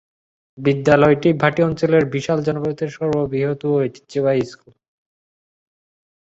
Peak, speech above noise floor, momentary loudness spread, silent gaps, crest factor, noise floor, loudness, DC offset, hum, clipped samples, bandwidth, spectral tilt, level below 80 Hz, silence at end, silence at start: -2 dBFS; over 72 dB; 9 LU; none; 18 dB; under -90 dBFS; -18 LUFS; under 0.1%; none; under 0.1%; 8 kHz; -7.5 dB/octave; -52 dBFS; 1.75 s; 0.55 s